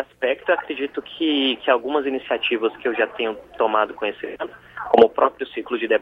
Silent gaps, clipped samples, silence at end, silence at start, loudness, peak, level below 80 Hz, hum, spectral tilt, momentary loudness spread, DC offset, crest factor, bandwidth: none; under 0.1%; 0 s; 0 s; -21 LUFS; 0 dBFS; -60 dBFS; 60 Hz at -60 dBFS; -5.5 dB/octave; 13 LU; under 0.1%; 20 dB; 5.2 kHz